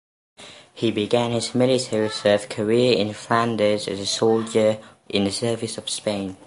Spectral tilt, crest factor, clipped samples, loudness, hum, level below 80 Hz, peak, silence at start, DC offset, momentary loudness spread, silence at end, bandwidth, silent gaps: -4.5 dB/octave; 18 dB; under 0.1%; -22 LUFS; none; -58 dBFS; -4 dBFS; 0.4 s; under 0.1%; 7 LU; 0.1 s; 11.5 kHz; none